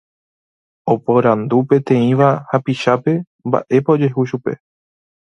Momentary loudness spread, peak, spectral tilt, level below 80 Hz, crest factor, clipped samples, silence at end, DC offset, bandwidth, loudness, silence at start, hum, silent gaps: 8 LU; 0 dBFS; -8.5 dB/octave; -60 dBFS; 16 dB; under 0.1%; 0.75 s; under 0.1%; 8.8 kHz; -16 LUFS; 0.85 s; none; 3.27-3.39 s